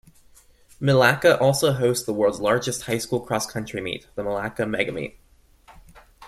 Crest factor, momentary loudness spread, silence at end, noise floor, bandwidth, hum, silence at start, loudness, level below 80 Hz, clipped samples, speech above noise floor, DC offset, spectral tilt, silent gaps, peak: 22 dB; 12 LU; 0 s; -54 dBFS; 15.5 kHz; none; 0.8 s; -22 LUFS; -54 dBFS; under 0.1%; 32 dB; under 0.1%; -4.5 dB/octave; none; -2 dBFS